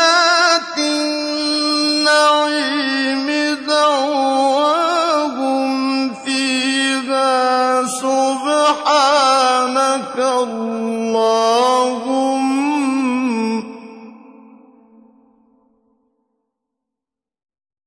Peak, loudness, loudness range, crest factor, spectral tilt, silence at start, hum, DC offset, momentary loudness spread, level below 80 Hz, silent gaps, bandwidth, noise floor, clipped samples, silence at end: -2 dBFS; -16 LUFS; 6 LU; 14 dB; -2 dB/octave; 0 s; none; under 0.1%; 7 LU; -70 dBFS; none; 11 kHz; -86 dBFS; under 0.1%; 3.75 s